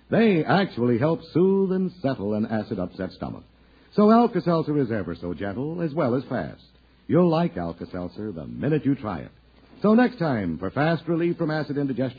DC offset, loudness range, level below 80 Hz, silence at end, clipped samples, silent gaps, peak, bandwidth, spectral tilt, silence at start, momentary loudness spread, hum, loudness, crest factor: under 0.1%; 3 LU; -54 dBFS; 0 s; under 0.1%; none; -4 dBFS; 5 kHz; -10 dB/octave; 0.1 s; 13 LU; none; -24 LUFS; 18 dB